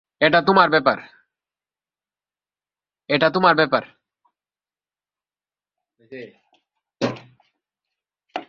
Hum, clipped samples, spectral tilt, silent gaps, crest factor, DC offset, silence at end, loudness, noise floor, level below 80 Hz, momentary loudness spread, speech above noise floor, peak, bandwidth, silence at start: 50 Hz at -65 dBFS; under 0.1%; -6 dB/octave; none; 22 dB; under 0.1%; 0.05 s; -18 LUFS; under -90 dBFS; -64 dBFS; 24 LU; over 72 dB; -2 dBFS; 7.2 kHz; 0.2 s